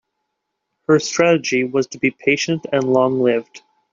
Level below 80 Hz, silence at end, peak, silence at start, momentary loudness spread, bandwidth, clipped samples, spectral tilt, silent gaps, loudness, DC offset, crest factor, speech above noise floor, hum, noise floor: -62 dBFS; 0.35 s; -2 dBFS; 0.9 s; 6 LU; 7.6 kHz; under 0.1%; -4.5 dB/octave; none; -18 LUFS; under 0.1%; 16 dB; 59 dB; none; -76 dBFS